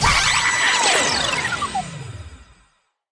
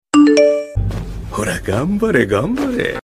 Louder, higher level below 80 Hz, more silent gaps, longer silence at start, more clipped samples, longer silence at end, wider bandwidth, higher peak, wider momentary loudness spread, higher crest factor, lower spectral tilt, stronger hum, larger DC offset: about the same, -17 LUFS vs -16 LUFS; second, -38 dBFS vs -30 dBFS; neither; second, 0 s vs 0.15 s; neither; first, 0.7 s vs 0.05 s; second, 10.5 kHz vs 14.5 kHz; second, -4 dBFS vs 0 dBFS; first, 19 LU vs 12 LU; about the same, 16 dB vs 16 dB; second, -1 dB/octave vs -6 dB/octave; neither; neither